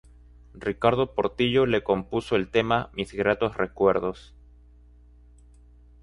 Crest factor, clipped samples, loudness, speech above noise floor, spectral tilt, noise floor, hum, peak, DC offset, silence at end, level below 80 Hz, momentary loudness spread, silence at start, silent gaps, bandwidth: 22 dB; under 0.1%; -25 LUFS; 28 dB; -6.5 dB/octave; -52 dBFS; 60 Hz at -50 dBFS; -6 dBFS; under 0.1%; 1.85 s; -50 dBFS; 10 LU; 0.55 s; none; 11 kHz